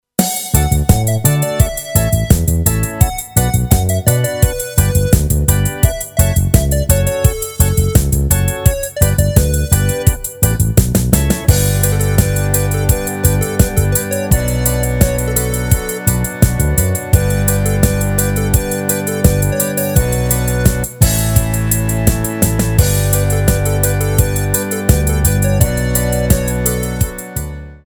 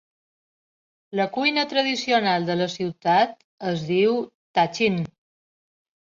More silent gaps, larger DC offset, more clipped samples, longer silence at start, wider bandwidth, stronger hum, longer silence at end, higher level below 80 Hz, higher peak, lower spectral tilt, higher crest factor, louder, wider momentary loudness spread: second, none vs 3.44-3.58 s, 4.35-4.54 s; neither; first, 0.1% vs under 0.1%; second, 0.2 s vs 1.1 s; first, over 20 kHz vs 7.6 kHz; neither; second, 0.1 s vs 0.95 s; first, -20 dBFS vs -66 dBFS; first, 0 dBFS vs -6 dBFS; about the same, -5 dB/octave vs -5 dB/octave; about the same, 14 dB vs 18 dB; first, -14 LUFS vs -23 LUFS; second, 3 LU vs 8 LU